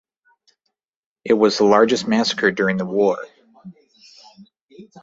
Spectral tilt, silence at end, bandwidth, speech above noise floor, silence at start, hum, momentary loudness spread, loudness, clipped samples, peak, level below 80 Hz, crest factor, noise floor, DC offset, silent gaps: -4.5 dB/octave; 0.05 s; 8 kHz; 59 dB; 1.25 s; none; 12 LU; -18 LUFS; under 0.1%; -2 dBFS; -62 dBFS; 20 dB; -76 dBFS; under 0.1%; 4.61-4.68 s